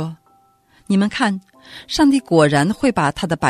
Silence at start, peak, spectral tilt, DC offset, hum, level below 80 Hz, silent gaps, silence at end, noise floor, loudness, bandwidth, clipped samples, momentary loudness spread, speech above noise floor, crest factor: 0 s; 0 dBFS; -5.5 dB/octave; under 0.1%; none; -48 dBFS; none; 0 s; -56 dBFS; -17 LUFS; 13.5 kHz; under 0.1%; 13 LU; 39 dB; 18 dB